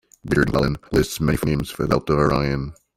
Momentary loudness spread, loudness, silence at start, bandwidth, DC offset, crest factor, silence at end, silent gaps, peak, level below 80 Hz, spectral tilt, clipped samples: 5 LU; -21 LUFS; 0.25 s; 16.5 kHz; under 0.1%; 18 dB; 0.25 s; none; -2 dBFS; -36 dBFS; -6.5 dB/octave; under 0.1%